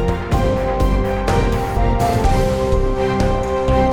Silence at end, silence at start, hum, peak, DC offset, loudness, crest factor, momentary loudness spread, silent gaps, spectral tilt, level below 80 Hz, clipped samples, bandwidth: 0 s; 0 s; none; -4 dBFS; under 0.1%; -18 LUFS; 12 dB; 2 LU; none; -7 dB/octave; -20 dBFS; under 0.1%; 17.5 kHz